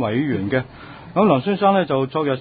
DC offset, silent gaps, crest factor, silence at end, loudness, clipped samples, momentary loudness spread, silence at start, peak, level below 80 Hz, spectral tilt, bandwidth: under 0.1%; none; 18 dB; 0 s; -19 LUFS; under 0.1%; 9 LU; 0 s; -2 dBFS; -52 dBFS; -12 dB/octave; 4.9 kHz